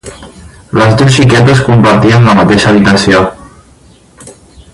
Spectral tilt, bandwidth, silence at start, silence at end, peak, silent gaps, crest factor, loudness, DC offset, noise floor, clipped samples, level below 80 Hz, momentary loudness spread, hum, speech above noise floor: -6 dB/octave; 11.5 kHz; 0.05 s; 0.45 s; 0 dBFS; none; 8 dB; -6 LUFS; under 0.1%; -40 dBFS; 0.5%; -32 dBFS; 5 LU; none; 35 dB